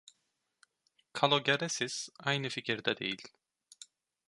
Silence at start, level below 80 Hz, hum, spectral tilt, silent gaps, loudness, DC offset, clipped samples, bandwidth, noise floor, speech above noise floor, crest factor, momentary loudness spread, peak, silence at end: 1.15 s; -78 dBFS; none; -3 dB/octave; none; -32 LUFS; under 0.1%; under 0.1%; 11.5 kHz; -81 dBFS; 48 dB; 26 dB; 25 LU; -10 dBFS; 0.45 s